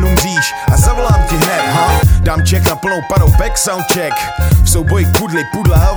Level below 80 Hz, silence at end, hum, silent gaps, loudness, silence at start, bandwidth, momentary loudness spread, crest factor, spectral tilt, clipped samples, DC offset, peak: -16 dBFS; 0 s; none; none; -12 LUFS; 0 s; over 20 kHz; 4 LU; 10 dB; -4.5 dB/octave; under 0.1%; under 0.1%; 0 dBFS